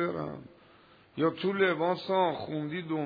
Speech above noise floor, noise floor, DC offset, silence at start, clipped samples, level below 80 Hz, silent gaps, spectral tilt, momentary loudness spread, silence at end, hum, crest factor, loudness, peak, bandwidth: 29 dB; -59 dBFS; under 0.1%; 0 s; under 0.1%; -72 dBFS; none; -8.5 dB/octave; 13 LU; 0 s; none; 16 dB; -30 LUFS; -14 dBFS; 5 kHz